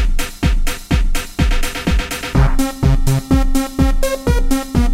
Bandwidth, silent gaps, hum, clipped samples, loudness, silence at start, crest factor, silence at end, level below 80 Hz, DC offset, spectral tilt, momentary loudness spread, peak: 16.5 kHz; none; none; under 0.1%; -18 LUFS; 0 s; 14 dB; 0 s; -16 dBFS; under 0.1%; -5.5 dB/octave; 4 LU; 0 dBFS